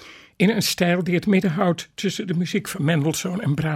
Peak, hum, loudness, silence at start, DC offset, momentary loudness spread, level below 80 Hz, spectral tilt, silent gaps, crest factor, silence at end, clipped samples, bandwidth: -4 dBFS; none; -22 LUFS; 0 s; under 0.1%; 6 LU; -56 dBFS; -5.5 dB/octave; none; 16 dB; 0 s; under 0.1%; 16 kHz